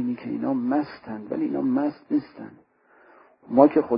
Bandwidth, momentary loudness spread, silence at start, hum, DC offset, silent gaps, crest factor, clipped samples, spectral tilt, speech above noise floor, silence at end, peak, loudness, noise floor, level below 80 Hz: 5.4 kHz; 20 LU; 0 s; none; under 0.1%; none; 22 dB; under 0.1%; -11.5 dB/octave; 33 dB; 0 s; -2 dBFS; -24 LUFS; -56 dBFS; -68 dBFS